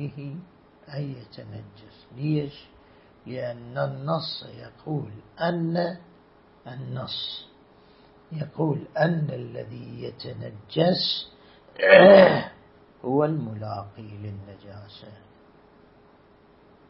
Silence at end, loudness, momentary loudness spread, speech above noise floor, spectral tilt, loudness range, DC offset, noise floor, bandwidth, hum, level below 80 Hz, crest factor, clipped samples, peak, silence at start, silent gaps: 1.75 s; -22 LUFS; 22 LU; 32 dB; -10.5 dB/octave; 15 LU; under 0.1%; -56 dBFS; 5.8 kHz; none; -62 dBFS; 26 dB; under 0.1%; 0 dBFS; 0 s; none